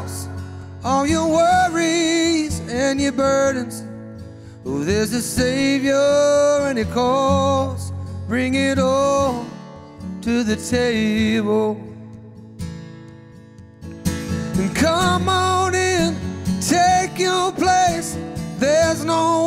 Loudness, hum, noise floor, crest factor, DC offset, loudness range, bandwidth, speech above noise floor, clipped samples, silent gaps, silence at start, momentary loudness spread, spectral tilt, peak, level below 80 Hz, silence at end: -19 LUFS; none; -42 dBFS; 14 dB; under 0.1%; 5 LU; 16 kHz; 24 dB; under 0.1%; none; 0 s; 17 LU; -4.5 dB/octave; -4 dBFS; -42 dBFS; 0 s